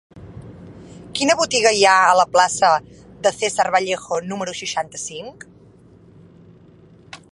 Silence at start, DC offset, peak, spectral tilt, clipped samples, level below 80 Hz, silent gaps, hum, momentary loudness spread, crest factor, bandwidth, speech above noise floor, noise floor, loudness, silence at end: 0.15 s; under 0.1%; 0 dBFS; -2 dB/octave; under 0.1%; -56 dBFS; none; none; 19 LU; 20 dB; 11.5 kHz; 30 dB; -48 dBFS; -18 LUFS; 0.2 s